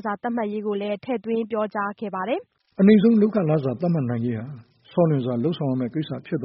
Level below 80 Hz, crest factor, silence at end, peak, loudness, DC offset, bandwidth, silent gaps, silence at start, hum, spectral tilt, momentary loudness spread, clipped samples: -64 dBFS; 18 dB; 0 s; -4 dBFS; -23 LUFS; under 0.1%; 5.4 kHz; none; 0.05 s; none; -7.5 dB/octave; 12 LU; under 0.1%